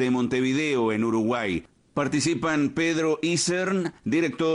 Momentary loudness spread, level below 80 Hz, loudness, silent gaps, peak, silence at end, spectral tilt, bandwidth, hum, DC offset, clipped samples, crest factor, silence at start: 4 LU; -58 dBFS; -25 LUFS; none; -14 dBFS; 0 s; -4.5 dB/octave; 11 kHz; none; under 0.1%; under 0.1%; 12 dB; 0 s